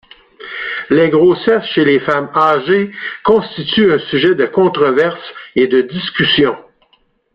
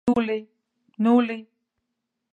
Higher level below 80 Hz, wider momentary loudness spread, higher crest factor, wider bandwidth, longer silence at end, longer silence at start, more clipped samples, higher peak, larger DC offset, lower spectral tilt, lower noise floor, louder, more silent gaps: first, -50 dBFS vs -62 dBFS; about the same, 10 LU vs 12 LU; second, 12 dB vs 18 dB; first, 5.6 kHz vs 4.6 kHz; second, 0.75 s vs 0.9 s; first, 0.4 s vs 0.05 s; neither; first, -2 dBFS vs -8 dBFS; neither; about the same, -7.5 dB/octave vs -7.5 dB/octave; second, -57 dBFS vs -81 dBFS; first, -13 LUFS vs -23 LUFS; neither